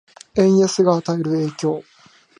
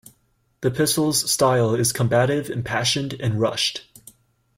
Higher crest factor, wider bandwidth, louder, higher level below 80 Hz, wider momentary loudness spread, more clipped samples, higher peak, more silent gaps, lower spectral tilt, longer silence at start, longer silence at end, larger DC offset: about the same, 16 dB vs 18 dB; second, 10.5 kHz vs 16.5 kHz; first, -18 LUFS vs -21 LUFS; about the same, -58 dBFS vs -54 dBFS; first, 10 LU vs 7 LU; neither; about the same, -2 dBFS vs -4 dBFS; neither; first, -6 dB/octave vs -4 dB/octave; second, 0.35 s vs 0.6 s; second, 0.6 s vs 0.75 s; neither